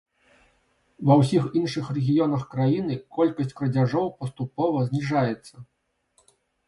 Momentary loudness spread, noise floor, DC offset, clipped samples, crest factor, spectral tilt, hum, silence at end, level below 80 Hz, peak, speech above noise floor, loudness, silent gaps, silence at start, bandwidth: 9 LU; -67 dBFS; under 0.1%; under 0.1%; 20 dB; -8 dB/octave; none; 1.05 s; -62 dBFS; -4 dBFS; 44 dB; -24 LUFS; none; 1 s; 11.5 kHz